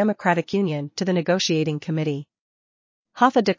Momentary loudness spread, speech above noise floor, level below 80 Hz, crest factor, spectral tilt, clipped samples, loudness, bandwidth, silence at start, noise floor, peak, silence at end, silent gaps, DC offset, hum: 6 LU; over 69 dB; -68 dBFS; 20 dB; -5.5 dB/octave; under 0.1%; -22 LUFS; 7.6 kHz; 0 s; under -90 dBFS; -4 dBFS; 0.05 s; 2.40-3.05 s; under 0.1%; none